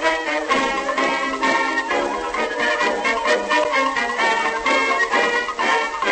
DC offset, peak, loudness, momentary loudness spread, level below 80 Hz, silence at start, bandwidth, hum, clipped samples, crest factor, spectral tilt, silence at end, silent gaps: under 0.1%; -6 dBFS; -19 LUFS; 4 LU; -50 dBFS; 0 s; 8.8 kHz; none; under 0.1%; 14 dB; -2 dB/octave; 0 s; none